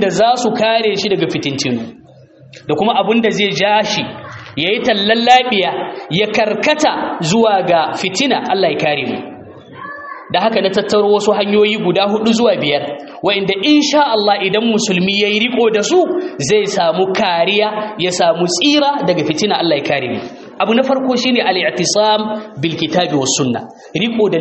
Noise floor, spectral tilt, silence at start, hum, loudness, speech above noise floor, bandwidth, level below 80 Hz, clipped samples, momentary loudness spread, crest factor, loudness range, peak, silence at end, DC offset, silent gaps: -42 dBFS; -4 dB/octave; 0 s; none; -14 LUFS; 28 dB; 8.4 kHz; -56 dBFS; under 0.1%; 8 LU; 14 dB; 3 LU; 0 dBFS; 0 s; under 0.1%; none